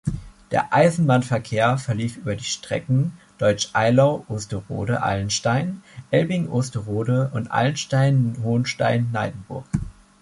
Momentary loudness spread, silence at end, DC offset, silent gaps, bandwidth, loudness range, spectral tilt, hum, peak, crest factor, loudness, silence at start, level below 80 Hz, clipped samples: 11 LU; 0.3 s; under 0.1%; none; 11.5 kHz; 1 LU; -6 dB/octave; none; -4 dBFS; 18 dB; -22 LUFS; 0.05 s; -46 dBFS; under 0.1%